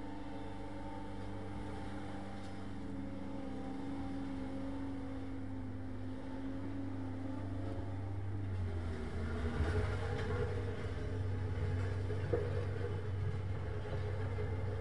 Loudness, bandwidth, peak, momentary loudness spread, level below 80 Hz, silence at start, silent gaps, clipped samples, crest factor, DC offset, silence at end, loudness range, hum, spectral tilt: -42 LUFS; 11 kHz; -22 dBFS; 8 LU; -50 dBFS; 0 s; none; under 0.1%; 20 dB; 0.5%; 0 s; 6 LU; none; -8 dB/octave